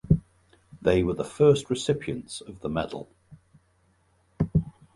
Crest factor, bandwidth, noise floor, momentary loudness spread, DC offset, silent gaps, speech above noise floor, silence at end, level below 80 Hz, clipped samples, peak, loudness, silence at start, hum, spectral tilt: 20 dB; 11.5 kHz; -66 dBFS; 14 LU; under 0.1%; none; 40 dB; 0.25 s; -44 dBFS; under 0.1%; -8 dBFS; -26 LUFS; 0.05 s; none; -6.5 dB/octave